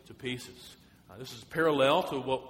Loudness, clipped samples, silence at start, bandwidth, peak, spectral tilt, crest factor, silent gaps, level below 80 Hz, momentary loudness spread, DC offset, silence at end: -29 LUFS; under 0.1%; 0.1 s; 16.5 kHz; -12 dBFS; -5 dB/octave; 20 dB; none; -64 dBFS; 22 LU; under 0.1%; 0 s